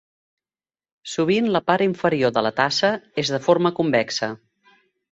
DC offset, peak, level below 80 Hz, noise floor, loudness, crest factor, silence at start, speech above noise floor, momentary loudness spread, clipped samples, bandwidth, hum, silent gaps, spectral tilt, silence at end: under 0.1%; -2 dBFS; -62 dBFS; under -90 dBFS; -21 LUFS; 20 dB; 1.05 s; over 70 dB; 9 LU; under 0.1%; 8.2 kHz; none; none; -5 dB/octave; 0.75 s